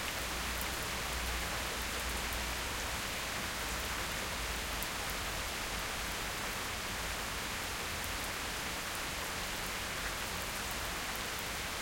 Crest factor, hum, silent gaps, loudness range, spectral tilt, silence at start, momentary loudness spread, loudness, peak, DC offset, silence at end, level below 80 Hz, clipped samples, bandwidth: 22 dB; none; none; 1 LU; -2 dB/octave; 0 s; 1 LU; -37 LUFS; -16 dBFS; under 0.1%; 0 s; -48 dBFS; under 0.1%; 17 kHz